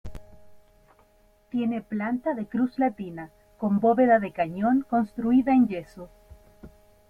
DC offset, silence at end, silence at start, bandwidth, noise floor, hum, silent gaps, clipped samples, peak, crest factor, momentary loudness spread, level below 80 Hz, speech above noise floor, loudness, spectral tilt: under 0.1%; 0.4 s; 0.05 s; 4.5 kHz; -60 dBFS; none; none; under 0.1%; -8 dBFS; 18 dB; 18 LU; -54 dBFS; 36 dB; -25 LUFS; -9 dB/octave